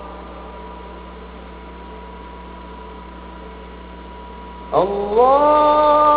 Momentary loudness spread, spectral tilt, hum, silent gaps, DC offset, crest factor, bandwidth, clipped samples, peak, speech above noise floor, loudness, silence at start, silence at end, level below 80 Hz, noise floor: 23 LU; -9.5 dB/octave; none; none; under 0.1%; 18 dB; 4 kHz; under 0.1%; -2 dBFS; 22 dB; -15 LUFS; 0 s; 0 s; -40 dBFS; -35 dBFS